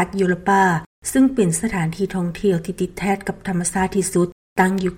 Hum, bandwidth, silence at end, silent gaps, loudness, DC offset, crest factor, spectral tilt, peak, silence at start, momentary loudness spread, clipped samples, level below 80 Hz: none; 16.5 kHz; 0 s; 0.86-1.02 s, 4.32-4.56 s; -20 LUFS; under 0.1%; 14 dB; -5.5 dB/octave; -4 dBFS; 0 s; 7 LU; under 0.1%; -44 dBFS